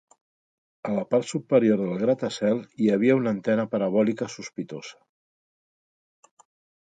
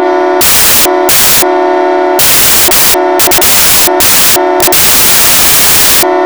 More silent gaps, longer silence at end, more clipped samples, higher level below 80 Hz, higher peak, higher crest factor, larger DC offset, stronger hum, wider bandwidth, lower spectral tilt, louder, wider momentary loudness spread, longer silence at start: neither; first, 1.9 s vs 0 s; neither; second, -72 dBFS vs -32 dBFS; second, -8 dBFS vs 0 dBFS; first, 18 dB vs 6 dB; neither; neither; second, 9.2 kHz vs over 20 kHz; first, -6.5 dB/octave vs -1 dB/octave; second, -24 LUFS vs -3 LUFS; first, 14 LU vs 4 LU; first, 0.85 s vs 0 s